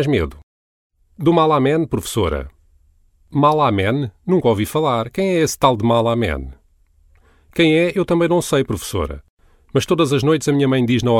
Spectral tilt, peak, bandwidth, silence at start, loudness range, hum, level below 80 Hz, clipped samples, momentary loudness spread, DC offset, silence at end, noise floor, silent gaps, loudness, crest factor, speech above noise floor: -6 dB/octave; 0 dBFS; 16.5 kHz; 0 s; 2 LU; none; -38 dBFS; under 0.1%; 10 LU; under 0.1%; 0 s; -55 dBFS; 0.43-0.90 s, 9.30-9.37 s; -17 LUFS; 18 dB; 38 dB